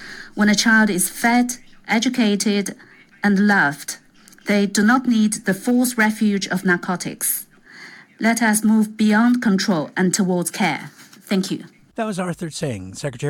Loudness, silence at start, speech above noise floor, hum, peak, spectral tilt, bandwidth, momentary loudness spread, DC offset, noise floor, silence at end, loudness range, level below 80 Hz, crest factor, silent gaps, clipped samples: -19 LUFS; 0 s; 24 dB; none; -4 dBFS; -4 dB/octave; 17.5 kHz; 14 LU; under 0.1%; -42 dBFS; 0 s; 2 LU; -58 dBFS; 16 dB; none; under 0.1%